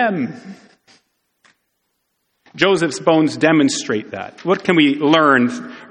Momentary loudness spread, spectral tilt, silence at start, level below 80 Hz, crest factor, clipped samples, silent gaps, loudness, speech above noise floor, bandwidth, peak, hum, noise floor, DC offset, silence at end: 13 LU; -4.5 dB/octave; 0 s; -62 dBFS; 18 dB; under 0.1%; none; -16 LUFS; 54 dB; 10 kHz; 0 dBFS; none; -71 dBFS; under 0.1%; 0.05 s